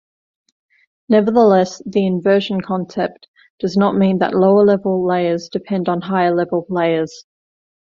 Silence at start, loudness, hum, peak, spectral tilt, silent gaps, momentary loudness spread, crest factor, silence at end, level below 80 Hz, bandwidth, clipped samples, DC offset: 1.1 s; -16 LUFS; none; -2 dBFS; -7 dB/octave; 3.28-3.34 s, 3.50-3.58 s; 10 LU; 16 dB; 0.75 s; -58 dBFS; 7.4 kHz; under 0.1%; under 0.1%